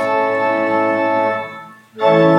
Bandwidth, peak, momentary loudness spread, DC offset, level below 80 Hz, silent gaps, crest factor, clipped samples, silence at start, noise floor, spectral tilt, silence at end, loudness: 8.6 kHz; -2 dBFS; 10 LU; under 0.1%; -70 dBFS; none; 14 dB; under 0.1%; 0 s; -36 dBFS; -7.5 dB/octave; 0 s; -16 LUFS